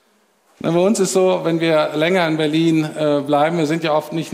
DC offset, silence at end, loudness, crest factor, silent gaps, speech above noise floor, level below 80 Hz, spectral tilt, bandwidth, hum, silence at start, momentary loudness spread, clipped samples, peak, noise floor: under 0.1%; 0 s; -17 LUFS; 14 dB; none; 42 dB; -68 dBFS; -5.5 dB/octave; 15.5 kHz; none; 0.65 s; 4 LU; under 0.1%; -2 dBFS; -59 dBFS